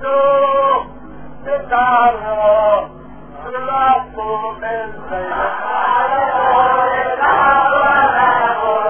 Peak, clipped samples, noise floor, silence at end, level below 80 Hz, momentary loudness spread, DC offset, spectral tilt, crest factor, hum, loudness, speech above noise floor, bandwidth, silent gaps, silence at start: 0 dBFS; under 0.1%; -35 dBFS; 0 s; -44 dBFS; 13 LU; under 0.1%; -7.5 dB/octave; 14 dB; none; -15 LUFS; 20 dB; 3.5 kHz; none; 0 s